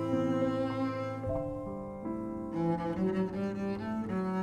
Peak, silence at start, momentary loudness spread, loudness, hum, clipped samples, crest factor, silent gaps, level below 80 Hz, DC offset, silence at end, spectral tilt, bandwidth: -18 dBFS; 0 s; 7 LU; -34 LUFS; none; under 0.1%; 14 dB; none; -56 dBFS; under 0.1%; 0 s; -8.5 dB/octave; 10.5 kHz